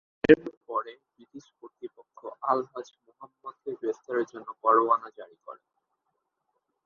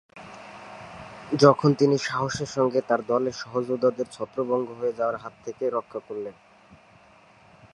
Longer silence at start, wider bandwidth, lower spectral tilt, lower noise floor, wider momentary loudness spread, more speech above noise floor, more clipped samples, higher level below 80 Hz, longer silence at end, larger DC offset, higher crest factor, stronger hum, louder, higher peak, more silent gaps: first, 0.3 s vs 0.15 s; second, 7 kHz vs 11 kHz; about the same, -7 dB/octave vs -6 dB/octave; first, -80 dBFS vs -54 dBFS; first, 25 LU vs 22 LU; first, 51 dB vs 30 dB; neither; about the same, -64 dBFS vs -64 dBFS; about the same, 1.3 s vs 1.4 s; neither; about the same, 28 dB vs 24 dB; neither; about the same, -27 LUFS vs -25 LUFS; about the same, -2 dBFS vs -2 dBFS; first, 0.57-0.61 s vs none